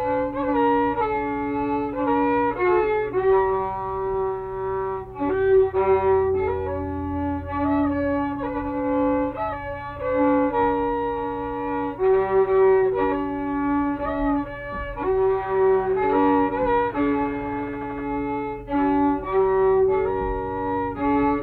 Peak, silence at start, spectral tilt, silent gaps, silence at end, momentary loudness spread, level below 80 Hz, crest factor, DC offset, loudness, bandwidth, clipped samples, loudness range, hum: -10 dBFS; 0 s; -9.5 dB/octave; none; 0 s; 9 LU; -42 dBFS; 12 dB; under 0.1%; -23 LUFS; 4.3 kHz; under 0.1%; 2 LU; none